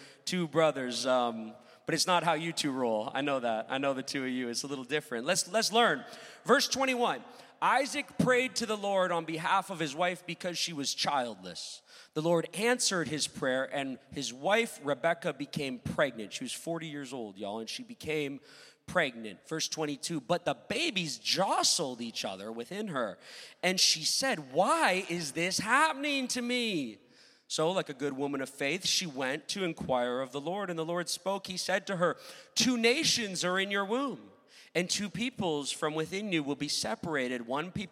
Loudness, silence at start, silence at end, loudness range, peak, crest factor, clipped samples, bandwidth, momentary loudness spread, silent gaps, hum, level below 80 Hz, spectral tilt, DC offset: -31 LUFS; 0 s; 0.05 s; 4 LU; -10 dBFS; 22 dB; under 0.1%; 16 kHz; 12 LU; none; none; -70 dBFS; -3 dB/octave; under 0.1%